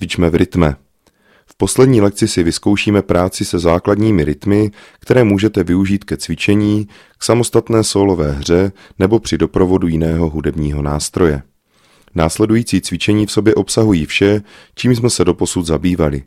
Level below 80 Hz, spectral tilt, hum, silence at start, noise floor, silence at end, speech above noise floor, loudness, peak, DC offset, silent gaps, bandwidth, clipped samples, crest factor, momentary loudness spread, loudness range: -32 dBFS; -5.5 dB/octave; none; 0 s; -54 dBFS; 0.05 s; 40 dB; -14 LUFS; 0 dBFS; under 0.1%; none; 15.5 kHz; under 0.1%; 14 dB; 6 LU; 2 LU